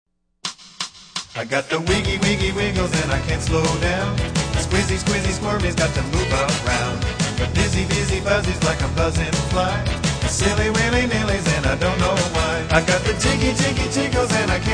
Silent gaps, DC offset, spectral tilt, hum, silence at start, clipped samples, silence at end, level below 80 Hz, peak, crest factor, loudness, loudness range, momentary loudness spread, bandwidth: none; under 0.1%; -4.5 dB/octave; none; 0.45 s; under 0.1%; 0 s; -30 dBFS; -2 dBFS; 18 dB; -20 LUFS; 2 LU; 4 LU; 10.5 kHz